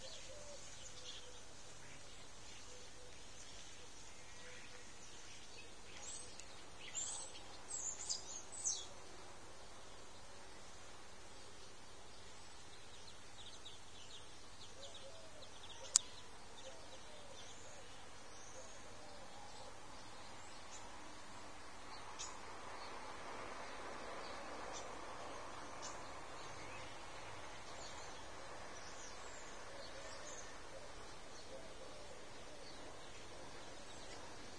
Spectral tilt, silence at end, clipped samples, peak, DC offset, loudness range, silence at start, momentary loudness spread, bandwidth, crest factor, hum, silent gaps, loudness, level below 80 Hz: -1 dB/octave; 0 s; under 0.1%; -4 dBFS; 0.2%; 12 LU; 0 s; 12 LU; 11 kHz; 48 dB; none; none; -50 LUFS; -68 dBFS